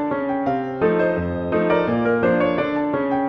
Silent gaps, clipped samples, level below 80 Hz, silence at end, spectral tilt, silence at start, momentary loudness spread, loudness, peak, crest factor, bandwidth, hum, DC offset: none; under 0.1%; -48 dBFS; 0 s; -9 dB/octave; 0 s; 4 LU; -20 LUFS; -6 dBFS; 14 dB; 5.8 kHz; none; under 0.1%